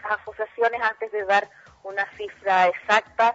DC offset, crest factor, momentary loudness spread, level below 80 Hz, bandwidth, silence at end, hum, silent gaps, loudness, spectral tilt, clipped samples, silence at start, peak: under 0.1%; 18 dB; 12 LU; -64 dBFS; 8 kHz; 0 s; none; none; -23 LUFS; -3 dB/octave; under 0.1%; 0 s; -6 dBFS